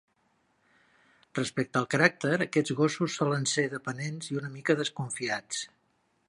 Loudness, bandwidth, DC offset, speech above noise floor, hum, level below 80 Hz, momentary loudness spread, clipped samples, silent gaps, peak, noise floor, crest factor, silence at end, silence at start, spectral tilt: -29 LUFS; 11.5 kHz; under 0.1%; 43 dB; none; -74 dBFS; 11 LU; under 0.1%; none; -6 dBFS; -72 dBFS; 26 dB; 0.6 s; 1.35 s; -4.5 dB/octave